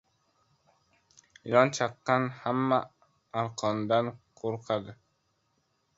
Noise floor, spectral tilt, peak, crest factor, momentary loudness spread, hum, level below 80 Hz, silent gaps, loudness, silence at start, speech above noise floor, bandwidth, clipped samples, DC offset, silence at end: -74 dBFS; -5.5 dB/octave; -6 dBFS; 26 dB; 13 LU; none; -72 dBFS; none; -29 LUFS; 1.45 s; 46 dB; 8 kHz; under 0.1%; under 0.1%; 1.05 s